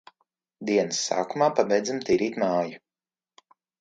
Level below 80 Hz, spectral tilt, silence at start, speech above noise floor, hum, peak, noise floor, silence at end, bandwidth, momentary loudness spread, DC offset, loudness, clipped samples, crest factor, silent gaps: -68 dBFS; -4 dB/octave; 0.6 s; over 65 dB; none; -6 dBFS; under -90 dBFS; 1.05 s; 9.4 kHz; 5 LU; under 0.1%; -25 LUFS; under 0.1%; 20 dB; none